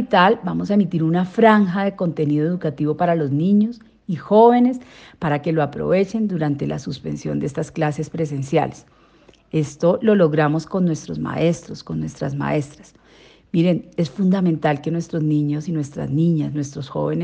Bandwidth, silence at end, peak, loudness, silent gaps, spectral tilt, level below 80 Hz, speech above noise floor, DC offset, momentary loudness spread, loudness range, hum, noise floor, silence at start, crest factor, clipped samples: 8.8 kHz; 0 s; 0 dBFS; -20 LUFS; none; -7.5 dB/octave; -54 dBFS; 33 dB; under 0.1%; 11 LU; 5 LU; none; -52 dBFS; 0 s; 18 dB; under 0.1%